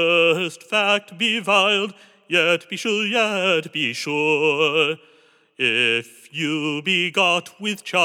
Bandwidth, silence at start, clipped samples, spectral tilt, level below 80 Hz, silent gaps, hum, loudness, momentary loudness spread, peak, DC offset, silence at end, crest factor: 17 kHz; 0 s; under 0.1%; -3.5 dB/octave; under -90 dBFS; none; none; -19 LUFS; 7 LU; -2 dBFS; under 0.1%; 0 s; 18 dB